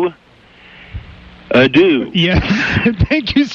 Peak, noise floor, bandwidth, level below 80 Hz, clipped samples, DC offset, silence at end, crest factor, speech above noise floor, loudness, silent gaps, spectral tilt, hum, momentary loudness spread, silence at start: -2 dBFS; -45 dBFS; 7.4 kHz; -30 dBFS; under 0.1%; under 0.1%; 0 s; 12 dB; 33 dB; -13 LUFS; none; -6.5 dB/octave; none; 23 LU; 0 s